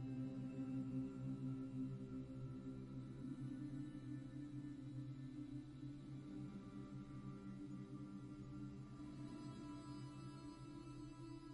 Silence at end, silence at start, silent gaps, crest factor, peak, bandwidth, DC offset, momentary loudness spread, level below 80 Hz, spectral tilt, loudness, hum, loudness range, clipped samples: 0 s; 0 s; none; 14 dB; -36 dBFS; 11 kHz; under 0.1%; 7 LU; -68 dBFS; -8 dB/octave; -52 LUFS; none; 5 LU; under 0.1%